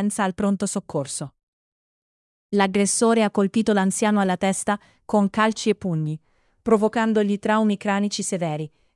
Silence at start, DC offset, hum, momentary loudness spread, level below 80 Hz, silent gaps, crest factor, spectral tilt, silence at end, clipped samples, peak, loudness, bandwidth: 0 s; under 0.1%; none; 9 LU; -60 dBFS; 1.43-2.50 s; 18 dB; -5 dB/octave; 0.3 s; under 0.1%; -4 dBFS; -22 LUFS; 12 kHz